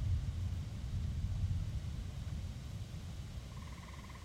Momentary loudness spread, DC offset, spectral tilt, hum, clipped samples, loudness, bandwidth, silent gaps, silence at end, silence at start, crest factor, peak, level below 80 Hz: 10 LU; under 0.1%; -6.5 dB/octave; none; under 0.1%; -43 LUFS; 14.5 kHz; none; 0 s; 0 s; 14 dB; -26 dBFS; -44 dBFS